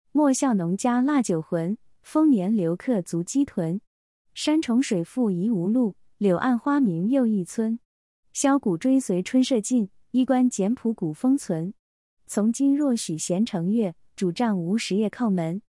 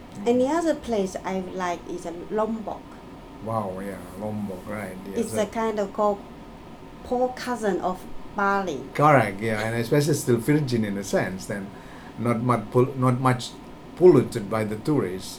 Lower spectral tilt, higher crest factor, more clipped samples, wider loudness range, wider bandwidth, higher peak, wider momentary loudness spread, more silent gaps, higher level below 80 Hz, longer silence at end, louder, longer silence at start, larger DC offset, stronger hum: about the same, -6 dB/octave vs -6.5 dB/octave; second, 14 dB vs 20 dB; neither; second, 2 LU vs 8 LU; second, 12 kHz vs 19 kHz; second, -10 dBFS vs -4 dBFS; second, 7 LU vs 17 LU; first, 3.87-4.25 s, 7.85-8.23 s, 11.79-12.17 s vs none; second, -68 dBFS vs -50 dBFS; about the same, 0.1 s vs 0 s; about the same, -24 LUFS vs -25 LUFS; first, 0.15 s vs 0 s; neither; neither